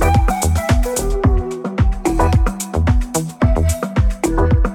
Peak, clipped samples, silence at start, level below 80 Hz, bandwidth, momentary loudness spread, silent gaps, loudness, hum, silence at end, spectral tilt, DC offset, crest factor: -4 dBFS; under 0.1%; 0 s; -18 dBFS; 17 kHz; 4 LU; none; -17 LUFS; none; 0 s; -6 dB/octave; under 0.1%; 12 dB